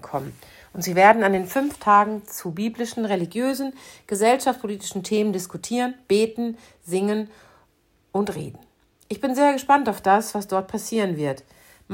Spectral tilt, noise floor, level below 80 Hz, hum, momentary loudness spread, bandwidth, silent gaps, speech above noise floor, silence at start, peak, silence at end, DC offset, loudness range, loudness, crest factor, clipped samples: -4.5 dB/octave; -63 dBFS; -62 dBFS; none; 14 LU; 16.5 kHz; none; 41 dB; 0.05 s; -2 dBFS; 0 s; under 0.1%; 6 LU; -22 LUFS; 22 dB; under 0.1%